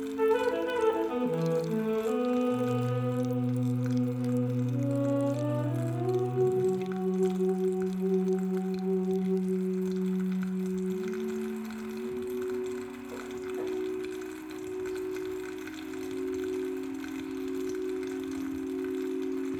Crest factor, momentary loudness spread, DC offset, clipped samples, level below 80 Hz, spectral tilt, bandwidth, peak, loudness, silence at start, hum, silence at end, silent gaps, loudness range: 16 dB; 9 LU; under 0.1%; under 0.1%; -66 dBFS; -7.5 dB/octave; over 20 kHz; -14 dBFS; -31 LUFS; 0 s; none; 0 s; none; 7 LU